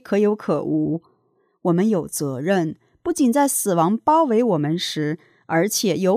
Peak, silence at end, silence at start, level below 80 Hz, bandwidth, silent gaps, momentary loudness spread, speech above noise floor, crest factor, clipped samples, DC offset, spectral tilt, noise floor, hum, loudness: -6 dBFS; 0 s; 0.05 s; -62 dBFS; 16 kHz; none; 10 LU; 45 dB; 14 dB; under 0.1%; under 0.1%; -5 dB/octave; -65 dBFS; none; -21 LUFS